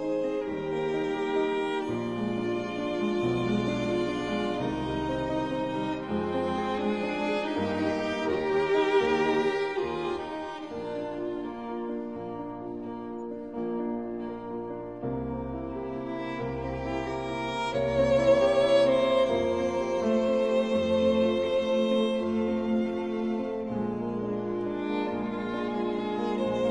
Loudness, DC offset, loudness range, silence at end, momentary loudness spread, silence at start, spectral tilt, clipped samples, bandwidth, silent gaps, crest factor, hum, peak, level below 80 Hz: -29 LUFS; 0.1%; 10 LU; 0 s; 11 LU; 0 s; -6.5 dB/octave; under 0.1%; 10.5 kHz; none; 18 dB; none; -10 dBFS; -54 dBFS